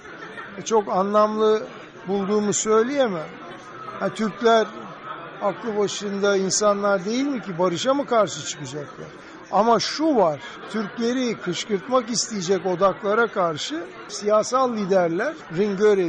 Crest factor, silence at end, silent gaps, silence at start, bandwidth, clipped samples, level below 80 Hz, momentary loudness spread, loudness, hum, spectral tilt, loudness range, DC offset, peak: 16 dB; 0 s; none; 0 s; 9.6 kHz; under 0.1%; -64 dBFS; 16 LU; -22 LUFS; none; -4 dB/octave; 2 LU; under 0.1%; -8 dBFS